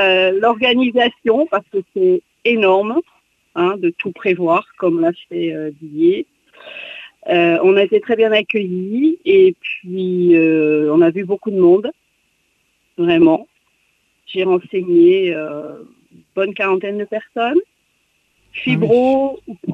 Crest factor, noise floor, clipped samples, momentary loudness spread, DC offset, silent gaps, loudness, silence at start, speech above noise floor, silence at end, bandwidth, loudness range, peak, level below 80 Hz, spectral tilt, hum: 14 dB; -63 dBFS; under 0.1%; 15 LU; under 0.1%; none; -15 LUFS; 0 s; 48 dB; 0 s; 4.1 kHz; 5 LU; -2 dBFS; -62 dBFS; -8 dB/octave; none